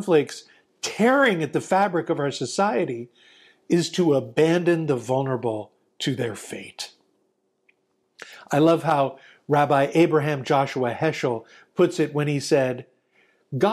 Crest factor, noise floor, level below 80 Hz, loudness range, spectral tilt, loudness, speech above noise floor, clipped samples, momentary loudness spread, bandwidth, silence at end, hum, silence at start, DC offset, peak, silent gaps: 16 dB; -70 dBFS; -70 dBFS; 6 LU; -5.5 dB/octave; -23 LUFS; 48 dB; under 0.1%; 16 LU; 14.5 kHz; 0 s; none; 0 s; under 0.1%; -8 dBFS; none